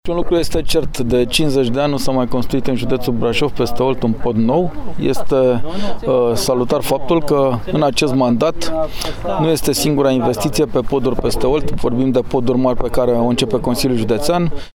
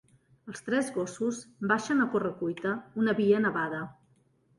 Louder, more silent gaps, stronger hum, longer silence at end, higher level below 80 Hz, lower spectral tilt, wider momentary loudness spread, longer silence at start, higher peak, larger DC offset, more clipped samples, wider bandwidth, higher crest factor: first, -17 LUFS vs -29 LUFS; neither; neither; second, 0.05 s vs 0.65 s; first, -30 dBFS vs -70 dBFS; about the same, -5.5 dB/octave vs -5.5 dB/octave; second, 4 LU vs 12 LU; second, 0.05 s vs 0.45 s; first, -2 dBFS vs -12 dBFS; neither; neither; first, 18 kHz vs 11.5 kHz; second, 12 dB vs 18 dB